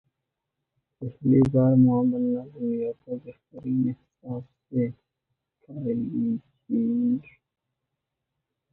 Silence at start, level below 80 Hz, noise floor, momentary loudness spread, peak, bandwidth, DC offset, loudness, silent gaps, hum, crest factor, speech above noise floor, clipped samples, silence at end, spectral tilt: 1 s; -60 dBFS; -83 dBFS; 18 LU; -8 dBFS; 2.7 kHz; under 0.1%; -25 LUFS; none; none; 18 dB; 59 dB; under 0.1%; 1.5 s; -12 dB/octave